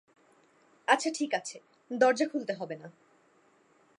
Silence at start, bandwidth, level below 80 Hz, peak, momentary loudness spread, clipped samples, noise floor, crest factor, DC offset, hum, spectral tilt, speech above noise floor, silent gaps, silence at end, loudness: 0.9 s; 11.5 kHz; -88 dBFS; -8 dBFS; 18 LU; under 0.1%; -65 dBFS; 24 dB; under 0.1%; none; -3 dB/octave; 36 dB; none; 1.1 s; -30 LUFS